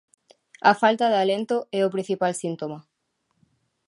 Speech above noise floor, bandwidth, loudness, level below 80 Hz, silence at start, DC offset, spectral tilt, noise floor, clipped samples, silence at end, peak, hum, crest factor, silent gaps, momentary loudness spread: 52 dB; 11.5 kHz; -23 LUFS; -78 dBFS; 0.65 s; under 0.1%; -4.5 dB/octave; -74 dBFS; under 0.1%; 1.05 s; -4 dBFS; none; 22 dB; none; 13 LU